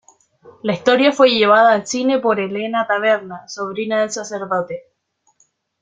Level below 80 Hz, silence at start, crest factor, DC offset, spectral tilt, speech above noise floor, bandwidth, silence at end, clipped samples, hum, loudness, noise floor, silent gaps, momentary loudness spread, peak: -64 dBFS; 0.65 s; 16 dB; under 0.1%; -3.5 dB/octave; 48 dB; 9.2 kHz; 1 s; under 0.1%; none; -17 LUFS; -64 dBFS; none; 15 LU; -2 dBFS